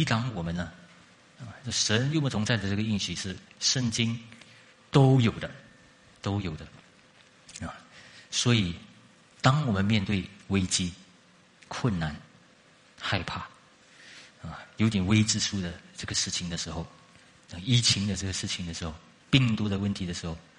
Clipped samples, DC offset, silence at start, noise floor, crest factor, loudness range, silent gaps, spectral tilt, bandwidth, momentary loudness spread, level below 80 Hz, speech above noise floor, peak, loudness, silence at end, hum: under 0.1%; under 0.1%; 0 s; -59 dBFS; 26 dB; 6 LU; none; -4.5 dB/octave; 11 kHz; 20 LU; -54 dBFS; 31 dB; -4 dBFS; -28 LUFS; 0.2 s; none